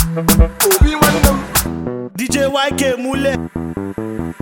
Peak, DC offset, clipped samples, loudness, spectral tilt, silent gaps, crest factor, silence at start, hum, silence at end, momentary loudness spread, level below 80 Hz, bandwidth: 0 dBFS; under 0.1%; under 0.1%; -15 LUFS; -4.5 dB/octave; none; 16 dB; 0 s; none; 0.1 s; 12 LU; -22 dBFS; 17 kHz